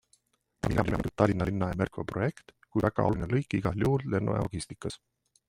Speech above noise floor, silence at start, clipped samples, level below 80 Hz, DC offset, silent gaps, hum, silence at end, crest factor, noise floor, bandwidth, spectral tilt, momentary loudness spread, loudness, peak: 41 dB; 0.65 s; under 0.1%; -48 dBFS; under 0.1%; none; none; 0.5 s; 22 dB; -70 dBFS; 14 kHz; -7.5 dB/octave; 9 LU; -30 LUFS; -8 dBFS